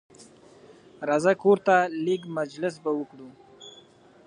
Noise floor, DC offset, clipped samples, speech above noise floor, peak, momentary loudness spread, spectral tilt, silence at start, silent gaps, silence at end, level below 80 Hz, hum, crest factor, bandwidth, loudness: -54 dBFS; under 0.1%; under 0.1%; 29 dB; -6 dBFS; 25 LU; -6 dB/octave; 0.2 s; none; 0.55 s; -76 dBFS; none; 20 dB; 10 kHz; -25 LUFS